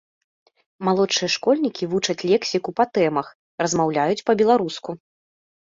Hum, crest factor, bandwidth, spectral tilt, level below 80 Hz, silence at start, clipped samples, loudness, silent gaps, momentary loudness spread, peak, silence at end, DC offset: none; 16 dB; 7.8 kHz; -4 dB/octave; -64 dBFS; 0.8 s; under 0.1%; -21 LUFS; 3.35-3.58 s; 9 LU; -6 dBFS; 0.8 s; under 0.1%